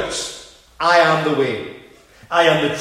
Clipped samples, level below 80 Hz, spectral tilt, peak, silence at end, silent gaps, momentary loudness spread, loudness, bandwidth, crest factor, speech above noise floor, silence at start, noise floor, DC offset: under 0.1%; -52 dBFS; -4 dB/octave; 0 dBFS; 0 s; none; 15 LU; -17 LUFS; 14.5 kHz; 18 dB; 30 dB; 0 s; -46 dBFS; under 0.1%